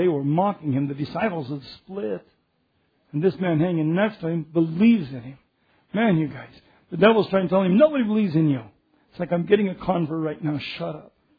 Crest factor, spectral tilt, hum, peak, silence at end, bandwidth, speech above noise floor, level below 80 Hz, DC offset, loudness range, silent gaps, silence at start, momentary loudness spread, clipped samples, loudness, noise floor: 18 dB; -10 dB/octave; none; -4 dBFS; 0.35 s; 5 kHz; 47 dB; -60 dBFS; under 0.1%; 6 LU; none; 0 s; 15 LU; under 0.1%; -23 LUFS; -69 dBFS